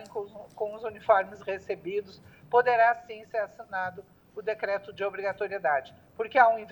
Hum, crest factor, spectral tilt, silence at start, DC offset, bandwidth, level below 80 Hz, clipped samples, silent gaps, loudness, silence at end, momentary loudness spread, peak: none; 22 dB; -5.5 dB/octave; 0 s; under 0.1%; 19 kHz; -70 dBFS; under 0.1%; none; -29 LUFS; 0 s; 15 LU; -6 dBFS